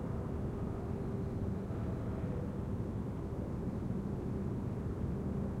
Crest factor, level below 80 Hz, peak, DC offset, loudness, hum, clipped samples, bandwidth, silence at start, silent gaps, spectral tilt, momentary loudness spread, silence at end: 12 dB; -48 dBFS; -26 dBFS; under 0.1%; -39 LUFS; none; under 0.1%; 12.5 kHz; 0 s; none; -9.5 dB/octave; 1 LU; 0 s